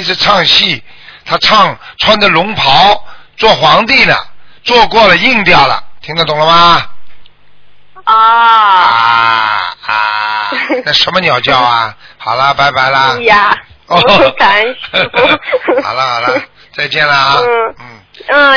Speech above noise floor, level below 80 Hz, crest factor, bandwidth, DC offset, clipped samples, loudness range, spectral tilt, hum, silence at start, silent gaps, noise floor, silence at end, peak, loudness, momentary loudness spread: 38 dB; -38 dBFS; 10 dB; 5.4 kHz; under 0.1%; 2%; 3 LU; -4 dB/octave; none; 0 s; none; -46 dBFS; 0 s; 0 dBFS; -8 LUFS; 9 LU